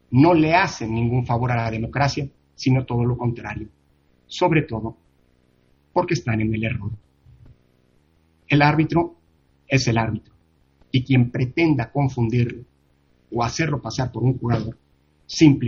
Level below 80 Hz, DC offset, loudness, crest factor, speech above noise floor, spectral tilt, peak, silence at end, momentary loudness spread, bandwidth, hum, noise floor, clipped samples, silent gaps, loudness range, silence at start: -46 dBFS; under 0.1%; -21 LUFS; 20 dB; 41 dB; -6.5 dB/octave; -2 dBFS; 0 s; 14 LU; 7.4 kHz; none; -61 dBFS; under 0.1%; none; 4 LU; 0.1 s